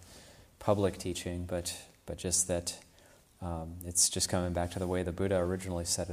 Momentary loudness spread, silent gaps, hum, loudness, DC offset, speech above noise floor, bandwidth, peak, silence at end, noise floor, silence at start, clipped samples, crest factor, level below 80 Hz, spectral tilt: 14 LU; none; none; -32 LUFS; under 0.1%; 28 dB; 15.5 kHz; -12 dBFS; 0 s; -61 dBFS; 0 s; under 0.1%; 22 dB; -54 dBFS; -3.5 dB/octave